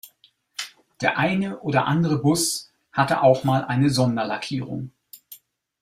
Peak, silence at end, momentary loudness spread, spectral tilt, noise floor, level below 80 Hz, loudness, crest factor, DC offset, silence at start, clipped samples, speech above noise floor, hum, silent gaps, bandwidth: -4 dBFS; 0.45 s; 16 LU; -5 dB/octave; -60 dBFS; -58 dBFS; -22 LUFS; 20 dB; under 0.1%; 0.05 s; under 0.1%; 39 dB; none; none; 16 kHz